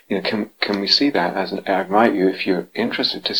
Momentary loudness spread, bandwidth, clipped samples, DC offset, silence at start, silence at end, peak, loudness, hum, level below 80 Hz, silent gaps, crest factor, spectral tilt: 7 LU; over 20 kHz; under 0.1%; 0.1%; 0.1 s; 0 s; 0 dBFS; -19 LUFS; none; -68 dBFS; none; 20 dB; -5 dB/octave